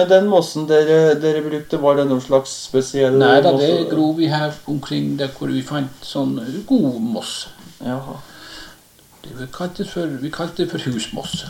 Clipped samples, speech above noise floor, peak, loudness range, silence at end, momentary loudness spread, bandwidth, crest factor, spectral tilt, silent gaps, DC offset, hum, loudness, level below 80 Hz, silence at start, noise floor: under 0.1%; 31 dB; 0 dBFS; 12 LU; 0 s; 17 LU; 16.5 kHz; 18 dB; -5.5 dB/octave; none; under 0.1%; none; -18 LUFS; -52 dBFS; 0 s; -49 dBFS